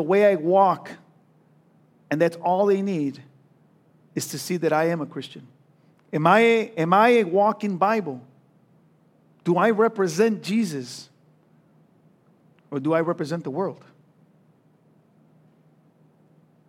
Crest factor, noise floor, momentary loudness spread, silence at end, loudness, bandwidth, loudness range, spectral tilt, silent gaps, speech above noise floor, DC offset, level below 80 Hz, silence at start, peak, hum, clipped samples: 22 dB; -59 dBFS; 16 LU; 2.95 s; -22 LUFS; 16.5 kHz; 9 LU; -6 dB/octave; none; 38 dB; under 0.1%; -82 dBFS; 0 s; -2 dBFS; none; under 0.1%